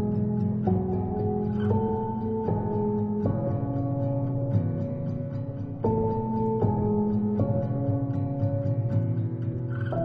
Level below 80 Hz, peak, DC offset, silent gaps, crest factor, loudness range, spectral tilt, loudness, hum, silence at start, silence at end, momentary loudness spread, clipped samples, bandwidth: -46 dBFS; -12 dBFS; under 0.1%; none; 14 dB; 2 LU; -12.5 dB/octave; -27 LUFS; none; 0 s; 0 s; 5 LU; under 0.1%; 3.3 kHz